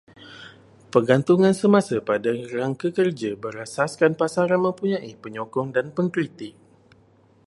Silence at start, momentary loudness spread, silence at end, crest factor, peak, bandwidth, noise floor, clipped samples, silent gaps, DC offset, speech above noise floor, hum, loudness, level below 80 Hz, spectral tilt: 0.2 s; 16 LU; 0.95 s; 22 dB; -2 dBFS; 11.5 kHz; -57 dBFS; under 0.1%; none; under 0.1%; 35 dB; none; -22 LUFS; -66 dBFS; -6.5 dB/octave